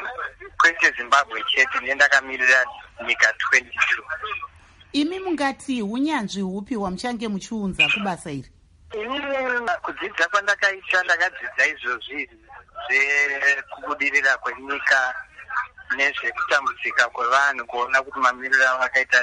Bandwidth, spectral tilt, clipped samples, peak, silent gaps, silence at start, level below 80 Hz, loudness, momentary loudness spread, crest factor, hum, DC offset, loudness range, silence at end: 11.5 kHz; -2.5 dB/octave; under 0.1%; -2 dBFS; none; 0 s; -56 dBFS; -21 LUFS; 13 LU; 20 dB; none; under 0.1%; 6 LU; 0 s